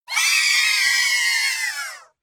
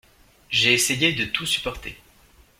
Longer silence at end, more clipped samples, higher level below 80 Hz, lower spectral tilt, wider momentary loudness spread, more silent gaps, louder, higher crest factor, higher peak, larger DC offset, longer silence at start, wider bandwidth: second, 0.2 s vs 0.65 s; neither; second, -68 dBFS vs -50 dBFS; second, 6 dB/octave vs -2 dB/octave; second, 11 LU vs 16 LU; neither; first, -17 LUFS vs -20 LUFS; second, 14 dB vs 22 dB; about the same, -6 dBFS vs -4 dBFS; neither; second, 0.1 s vs 0.5 s; first, 19 kHz vs 16.5 kHz